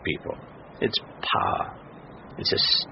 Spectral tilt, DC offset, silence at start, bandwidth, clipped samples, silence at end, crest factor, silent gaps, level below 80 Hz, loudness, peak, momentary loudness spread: -1 dB/octave; under 0.1%; 0 s; 6 kHz; under 0.1%; 0 s; 18 dB; none; -54 dBFS; -25 LUFS; -10 dBFS; 24 LU